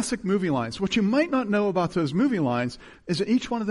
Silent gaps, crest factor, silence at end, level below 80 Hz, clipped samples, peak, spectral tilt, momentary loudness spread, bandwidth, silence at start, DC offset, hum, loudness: none; 14 dB; 0 s; -54 dBFS; under 0.1%; -10 dBFS; -6 dB/octave; 6 LU; 11.5 kHz; 0 s; under 0.1%; none; -25 LUFS